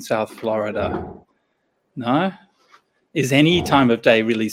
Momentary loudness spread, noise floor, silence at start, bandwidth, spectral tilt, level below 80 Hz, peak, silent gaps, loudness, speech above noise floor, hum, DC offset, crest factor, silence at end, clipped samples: 14 LU; -69 dBFS; 0 s; 16.5 kHz; -5.5 dB/octave; -52 dBFS; 0 dBFS; none; -19 LUFS; 51 dB; none; under 0.1%; 20 dB; 0 s; under 0.1%